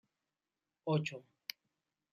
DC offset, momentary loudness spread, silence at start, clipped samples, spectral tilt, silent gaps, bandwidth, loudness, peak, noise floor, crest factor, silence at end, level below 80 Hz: under 0.1%; 12 LU; 0.85 s; under 0.1%; -6 dB/octave; none; 13 kHz; -40 LUFS; -20 dBFS; under -90 dBFS; 24 dB; 0.9 s; -86 dBFS